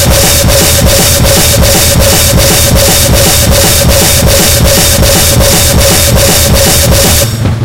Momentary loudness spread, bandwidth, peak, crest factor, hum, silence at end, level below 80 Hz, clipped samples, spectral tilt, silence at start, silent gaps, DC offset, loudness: 0 LU; over 20 kHz; 0 dBFS; 6 dB; none; 0 s; -14 dBFS; 5%; -3 dB/octave; 0 s; none; 2%; -4 LUFS